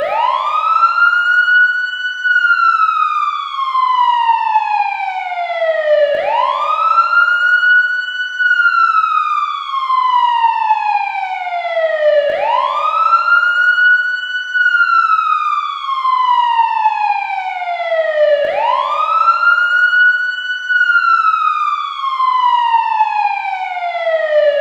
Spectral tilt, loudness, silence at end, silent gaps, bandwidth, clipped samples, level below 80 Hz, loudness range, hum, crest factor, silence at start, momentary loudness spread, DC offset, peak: 0 dB/octave; -13 LUFS; 0 s; none; 8 kHz; under 0.1%; -70 dBFS; 3 LU; none; 12 dB; 0 s; 8 LU; under 0.1%; -2 dBFS